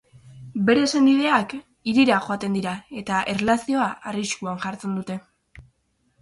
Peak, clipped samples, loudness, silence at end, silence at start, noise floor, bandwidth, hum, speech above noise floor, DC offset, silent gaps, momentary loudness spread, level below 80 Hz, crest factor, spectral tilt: -4 dBFS; under 0.1%; -22 LUFS; 0.6 s; 0.25 s; -68 dBFS; 11.5 kHz; none; 46 dB; under 0.1%; none; 14 LU; -58 dBFS; 18 dB; -5 dB/octave